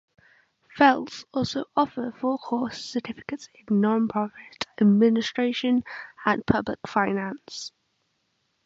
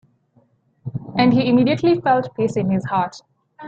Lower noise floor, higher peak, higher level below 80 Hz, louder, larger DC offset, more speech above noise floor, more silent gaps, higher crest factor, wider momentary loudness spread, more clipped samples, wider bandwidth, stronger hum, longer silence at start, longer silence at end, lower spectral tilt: first, -73 dBFS vs -59 dBFS; about the same, -4 dBFS vs -2 dBFS; about the same, -58 dBFS vs -54 dBFS; second, -25 LUFS vs -18 LUFS; neither; first, 49 dB vs 42 dB; neither; about the same, 20 dB vs 16 dB; about the same, 16 LU vs 14 LU; neither; about the same, 7.8 kHz vs 7.8 kHz; neither; about the same, 0.75 s vs 0.85 s; first, 1 s vs 0 s; second, -6 dB/octave vs -7.5 dB/octave